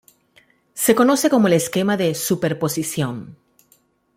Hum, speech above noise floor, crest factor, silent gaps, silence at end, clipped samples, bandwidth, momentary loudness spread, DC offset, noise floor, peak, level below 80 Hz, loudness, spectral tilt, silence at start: none; 42 dB; 18 dB; none; 0.8 s; under 0.1%; 16.5 kHz; 10 LU; under 0.1%; -60 dBFS; -2 dBFS; -60 dBFS; -18 LUFS; -4.5 dB/octave; 0.75 s